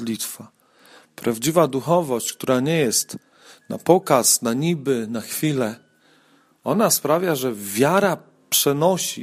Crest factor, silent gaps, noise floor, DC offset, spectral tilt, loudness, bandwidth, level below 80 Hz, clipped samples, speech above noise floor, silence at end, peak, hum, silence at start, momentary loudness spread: 20 dB; none; -58 dBFS; under 0.1%; -4 dB/octave; -20 LUFS; 15.5 kHz; -66 dBFS; under 0.1%; 37 dB; 0 s; 0 dBFS; none; 0 s; 12 LU